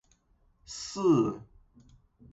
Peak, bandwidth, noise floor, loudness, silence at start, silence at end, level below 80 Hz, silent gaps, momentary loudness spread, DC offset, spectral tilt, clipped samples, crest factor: -14 dBFS; 8 kHz; -67 dBFS; -28 LUFS; 0.7 s; 0.9 s; -62 dBFS; none; 19 LU; under 0.1%; -6 dB/octave; under 0.1%; 18 dB